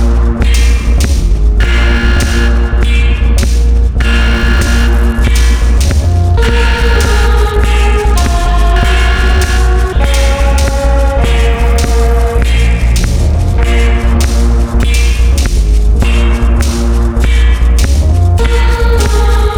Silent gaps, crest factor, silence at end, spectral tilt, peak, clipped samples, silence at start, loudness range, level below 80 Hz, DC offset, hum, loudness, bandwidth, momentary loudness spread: none; 8 dB; 0 s; -5.5 dB/octave; 0 dBFS; under 0.1%; 0 s; 1 LU; -8 dBFS; under 0.1%; none; -11 LUFS; 13 kHz; 2 LU